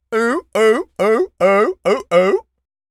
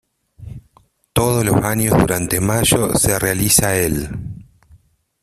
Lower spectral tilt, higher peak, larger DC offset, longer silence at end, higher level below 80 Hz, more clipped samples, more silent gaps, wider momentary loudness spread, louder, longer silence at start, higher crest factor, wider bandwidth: about the same, -5 dB/octave vs -4 dB/octave; about the same, -2 dBFS vs 0 dBFS; neither; second, 0.5 s vs 0.8 s; second, -58 dBFS vs -36 dBFS; neither; neither; second, 4 LU vs 18 LU; about the same, -16 LUFS vs -16 LUFS; second, 0.1 s vs 0.4 s; about the same, 16 dB vs 18 dB; second, 13.5 kHz vs 16 kHz